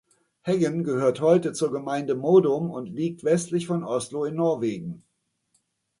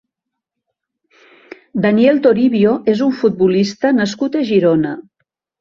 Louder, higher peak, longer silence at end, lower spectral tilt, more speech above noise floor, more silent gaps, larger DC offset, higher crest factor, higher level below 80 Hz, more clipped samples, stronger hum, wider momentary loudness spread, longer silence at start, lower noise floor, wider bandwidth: second, -24 LUFS vs -14 LUFS; second, -6 dBFS vs -2 dBFS; first, 1 s vs 0.6 s; about the same, -6.5 dB/octave vs -7 dB/octave; second, 48 dB vs 66 dB; neither; neither; about the same, 18 dB vs 14 dB; second, -68 dBFS vs -56 dBFS; neither; neither; first, 11 LU vs 7 LU; second, 0.45 s vs 1.75 s; second, -72 dBFS vs -80 dBFS; first, 11.5 kHz vs 7.4 kHz